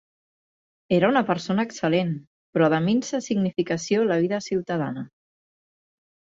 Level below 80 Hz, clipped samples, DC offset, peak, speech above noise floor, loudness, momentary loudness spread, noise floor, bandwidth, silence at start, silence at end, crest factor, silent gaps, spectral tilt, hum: -64 dBFS; under 0.1%; under 0.1%; -6 dBFS; over 67 dB; -24 LUFS; 10 LU; under -90 dBFS; 7.8 kHz; 0.9 s; 1.15 s; 20 dB; 2.27-2.53 s; -6 dB/octave; none